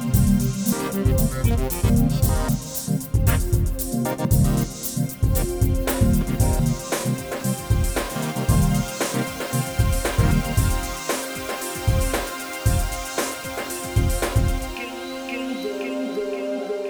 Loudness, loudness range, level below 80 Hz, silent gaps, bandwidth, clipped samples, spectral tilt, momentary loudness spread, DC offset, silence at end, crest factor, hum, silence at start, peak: -23 LUFS; 3 LU; -28 dBFS; none; over 20 kHz; under 0.1%; -5.5 dB/octave; 7 LU; under 0.1%; 0 s; 16 dB; none; 0 s; -6 dBFS